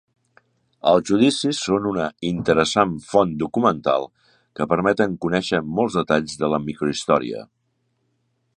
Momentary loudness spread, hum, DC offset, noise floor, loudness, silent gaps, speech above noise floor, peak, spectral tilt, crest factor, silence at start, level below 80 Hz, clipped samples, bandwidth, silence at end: 7 LU; none; under 0.1%; -70 dBFS; -21 LUFS; none; 50 dB; -2 dBFS; -5 dB/octave; 20 dB; 0.85 s; -52 dBFS; under 0.1%; 11 kHz; 1.1 s